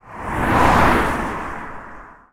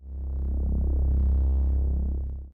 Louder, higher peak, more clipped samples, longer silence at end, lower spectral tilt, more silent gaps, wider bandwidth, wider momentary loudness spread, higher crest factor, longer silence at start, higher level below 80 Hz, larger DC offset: first, -18 LUFS vs -27 LUFS; first, -2 dBFS vs -18 dBFS; neither; first, 0.2 s vs 0.05 s; second, -5.5 dB/octave vs -13 dB/octave; neither; first, over 20 kHz vs 1.2 kHz; first, 21 LU vs 8 LU; first, 18 dB vs 6 dB; about the same, 0.05 s vs 0 s; second, -30 dBFS vs -24 dBFS; neither